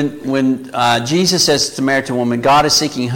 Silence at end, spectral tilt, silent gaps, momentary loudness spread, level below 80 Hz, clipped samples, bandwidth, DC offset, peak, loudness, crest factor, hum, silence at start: 0 s; -3.5 dB/octave; none; 6 LU; -46 dBFS; under 0.1%; 17 kHz; under 0.1%; -2 dBFS; -14 LUFS; 12 dB; none; 0 s